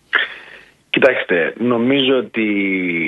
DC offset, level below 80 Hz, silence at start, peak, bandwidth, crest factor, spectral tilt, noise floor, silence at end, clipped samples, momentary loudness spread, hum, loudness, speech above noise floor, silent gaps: under 0.1%; -64 dBFS; 0.15 s; 0 dBFS; 7.4 kHz; 18 dB; -6.5 dB/octave; -43 dBFS; 0 s; under 0.1%; 6 LU; none; -16 LUFS; 27 dB; none